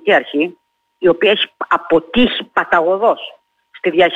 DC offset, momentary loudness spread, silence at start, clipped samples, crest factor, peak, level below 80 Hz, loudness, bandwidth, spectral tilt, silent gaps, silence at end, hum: under 0.1%; 8 LU; 0.05 s; under 0.1%; 12 dB; -2 dBFS; -46 dBFS; -15 LUFS; 7.8 kHz; -6 dB/octave; none; 0 s; none